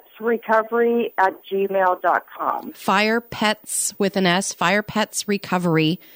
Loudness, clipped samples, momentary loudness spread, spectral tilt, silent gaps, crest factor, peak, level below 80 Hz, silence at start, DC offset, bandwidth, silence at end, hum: -21 LUFS; under 0.1%; 6 LU; -4 dB/octave; none; 16 dB; -4 dBFS; -62 dBFS; 0.2 s; under 0.1%; 16.5 kHz; 0.2 s; none